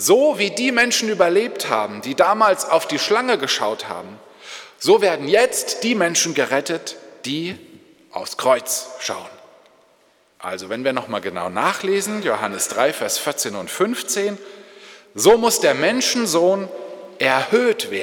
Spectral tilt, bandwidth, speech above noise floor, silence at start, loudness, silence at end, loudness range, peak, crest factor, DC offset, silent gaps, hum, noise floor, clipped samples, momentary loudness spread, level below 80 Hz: -2.5 dB/octave; 19 kHz; 39 dB; 0 s; -19 LUFS; 0 s; 7 LU; -2 dBFS; 18 dB; under 0.1%; none; none; -58 dBFS; under 0.1%; 16 LU; -62 dBFS